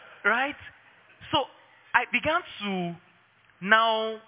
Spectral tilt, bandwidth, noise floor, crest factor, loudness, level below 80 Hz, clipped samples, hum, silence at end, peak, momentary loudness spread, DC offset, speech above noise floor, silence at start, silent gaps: -1 dB/octave; 4 kHz; -61 dBFS; 24 dB; -26 LUFS; -62 dBFS; under 0.1%; none; 0.1 s; -4 dBFS; 16 LU; under 0.1%; 35 dB; 0.1 s; none